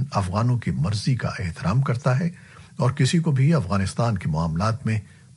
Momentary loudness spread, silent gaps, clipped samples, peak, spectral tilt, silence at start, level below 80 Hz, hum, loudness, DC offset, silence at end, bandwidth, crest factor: 7 LU; none; under 0.1%; -8 dBFS; -6.5 dB/octave; 0 s; -46 dBFS; none; -23 LUFS; under 0.1%; 0.35 s; 11.5 kHz; 14 dB